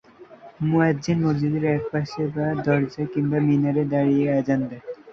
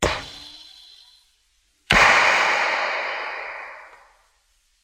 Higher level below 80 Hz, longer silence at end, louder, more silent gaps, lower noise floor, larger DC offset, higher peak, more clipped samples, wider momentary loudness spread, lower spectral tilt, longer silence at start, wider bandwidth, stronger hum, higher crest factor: second, -56 dBFS vs -44 dBFS; second, 0 s vs 0.95 s; second, -22 LUFS vs -18 LUFS; neither; second, -46 dBFS vs -65 dBFS; neither; second, -6 dBFS vs -2 dBFS; neither; second, 7 LU vs 24 LU; first, -8.5 dB/octave vs -2 dB/octave; first, 0.2 s vs 0 s; second, 7.2 kHz vs 16 kHz; neither; second, 16 dB vs 22 dB